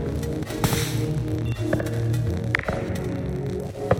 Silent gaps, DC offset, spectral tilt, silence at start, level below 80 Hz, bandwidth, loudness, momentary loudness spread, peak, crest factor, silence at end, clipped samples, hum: none; under 0.1%; -6 dB/octave; 0 s; -38 dBFS; 17 kHz; -26 LUFS; 5 LU; -4 dBFS; 22 dB; 0 s; under 0.1%; none